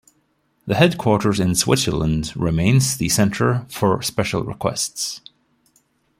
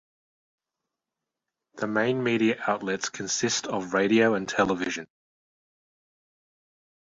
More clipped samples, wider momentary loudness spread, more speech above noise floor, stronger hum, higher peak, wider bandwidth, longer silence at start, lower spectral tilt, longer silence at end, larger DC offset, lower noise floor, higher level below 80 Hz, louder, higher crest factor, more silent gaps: neither; about the same, 8 LU vs 8 LU; second, 46 dB vs 62 dB; neither; first, -2 dBFS vs -6 dBFS; first, 16.5 kHz vs 7.8 kHz; second, 0.65 s vs 1.75 s; about the same, -4.5 dB/octave vs -3.5 dB/octave; second, 1 s vs 2.05 s; neither; second, -65 dBFS vs -87 dBFS; first, -42 dBFS vs -66 dBFS; first, -19 LUFS vs -26 LUFS; about the same, 18 dB vs 22 dB; neither